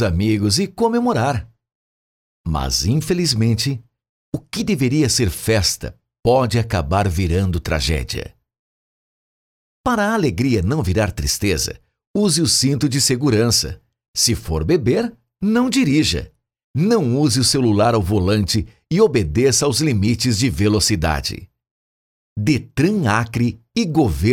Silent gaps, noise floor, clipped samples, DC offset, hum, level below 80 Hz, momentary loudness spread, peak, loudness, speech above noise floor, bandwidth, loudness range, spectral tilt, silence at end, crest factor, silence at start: 1.75-2.44 s, 4.09-4.32 s, 6.19-6.23 s, 8.59-9.84 s, 12.07-12.14 s, 14.08-14.14 s, 16.64-16.74 s, 21.71-22.36 s; under -90 dBFS; under 0.1%; under 0.1%; none; -34 dBFS; 10 LU; -2 dBFS; -18 LUFS; over 73 dB; 17 kHz; 5 LU; -4.5 dB/octave; 0 s; 16 dB; 0 s